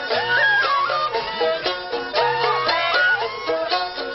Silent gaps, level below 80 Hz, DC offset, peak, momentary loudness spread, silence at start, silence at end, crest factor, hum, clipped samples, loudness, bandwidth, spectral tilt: none; -56 dBFS; under 0.1%; -6 dBFS; 7 LU; 0 s; 0 s; 14 dB; none; under 0.1%; -20 LUFS; 6 kHz; 1 dB/octave